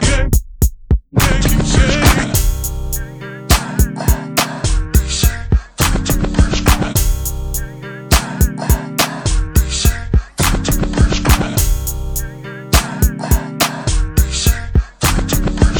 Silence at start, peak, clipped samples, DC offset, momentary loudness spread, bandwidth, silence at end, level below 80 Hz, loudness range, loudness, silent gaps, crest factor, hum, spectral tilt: 0 s; 0 dBFS; under 0.1%; under 0.1%; 8 LU; over 20 kHz; 0 s; -16 dBFS; 2 LU; -16 LUFS; none; 14 dB; none; -4 dB/octave